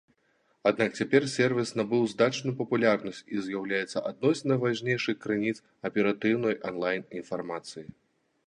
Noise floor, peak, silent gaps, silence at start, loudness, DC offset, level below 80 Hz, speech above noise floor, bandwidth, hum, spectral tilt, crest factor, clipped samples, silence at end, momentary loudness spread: -70 dBFS; -8 dBFS; none; 0.65 s; -28 LUFS; under 0.1%; -70 dBFS; 42 dB; 11 kHz; none; -5.5 dB/octave; 20 dB; under 0.1%; 0.55 s; 10 LU